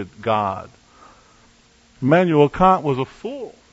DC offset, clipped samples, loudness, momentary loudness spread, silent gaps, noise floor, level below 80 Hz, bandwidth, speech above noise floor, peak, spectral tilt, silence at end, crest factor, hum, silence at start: under 0.1%; under 0.1%; -18 LUFS; 17 LU; none; -54 dBFS; -46 dBFS; 8 kHz; 35 dB; -2 dBFS; -8 dB/octave; 0.2 s; 18 dB; none; 0 s